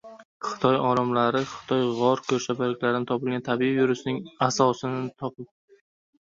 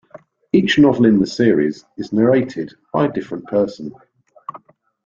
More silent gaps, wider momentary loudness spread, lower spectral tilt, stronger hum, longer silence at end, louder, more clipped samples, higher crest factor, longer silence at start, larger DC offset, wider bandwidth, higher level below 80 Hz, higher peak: first, 0.25-0.40 s vs none; second, 11 LU vs 21 LU; second, -5.5 dB/octave vs -7 dB/octave; neither; first, 0.95 s vs 0.5 s; second, -25 LUFS vs -17 LUFS; neither; about the same, 20 dB vs 16 dB; about the same, 0.05 s vs 0.15 s; neither; about the same, 7.8 kHz vs 7.6 kHz; second, -64 dBFS vs -54 dBFS; second, -6 dBFS vs -2 dBFS